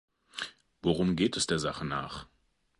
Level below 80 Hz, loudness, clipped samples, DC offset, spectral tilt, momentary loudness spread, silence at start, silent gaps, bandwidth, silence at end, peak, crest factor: -54 dBFS; -31 LUFS; under 0.1%; under 0.1%; -4.5 dB/octave; 14 LU; 0.35 s; none; 11.5 kHz; 0.55 s; -14 dBFS; 18 dB